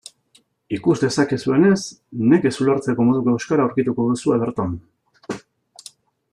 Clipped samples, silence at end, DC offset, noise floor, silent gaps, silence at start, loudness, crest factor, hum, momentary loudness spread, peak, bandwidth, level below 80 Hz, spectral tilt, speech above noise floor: under 0.1%; 0.95 s; under 0.1%; -59 dBFS; none; 0.7 s; -19 LUFS; 16 dB; none; 15 LU; -4 dBFS; 11.5 kHz; -58 dBFS; -6.5 dB/octave; 41 dB